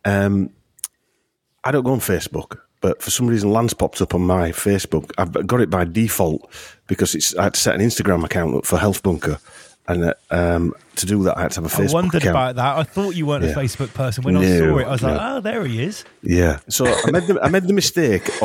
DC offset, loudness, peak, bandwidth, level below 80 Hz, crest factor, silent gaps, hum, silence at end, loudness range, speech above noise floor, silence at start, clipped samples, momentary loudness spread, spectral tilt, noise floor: under 0.1%; -19 LUFS; -2 dBFS; 17 kHz; -38 dBFS; 18 dB; none; none; 0 s; 2 LU; 51 dB; 0.05 s; under 0.1%; 9 LU; -5 dB/octave; -69 dBFS